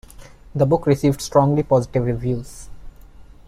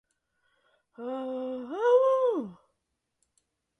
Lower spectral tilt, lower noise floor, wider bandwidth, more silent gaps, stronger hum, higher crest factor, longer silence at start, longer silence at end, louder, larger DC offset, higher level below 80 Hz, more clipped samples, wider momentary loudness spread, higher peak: first, -7.5 dB/octave vs -6 dB/octave; second, -42 dBFS vs -81 dBFS; first, 15 kHz vs 6.4 kHz; neither; neither; about the same, 18 dB vs 18 dB; second, 0.2 s vs 1 s; second, 0.25 s vs 1.25 s; first, -19 LUFS vs -27 LUFS; neither; first, -40 dBFS vs -82 dBFS; neither; about the same, 14 LU vs 16 LU; first, -2 dBFS vs -12 dBFS